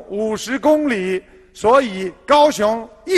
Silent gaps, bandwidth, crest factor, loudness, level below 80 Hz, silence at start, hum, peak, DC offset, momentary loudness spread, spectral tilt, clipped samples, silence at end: none; 13 kHz; 16 dB; -17 LUFS; -50 dBFS; 0 s; none; -2 dBFS; under 0.1%; 12 LU; -4.5 dB/octave; under 0.1%; 0 s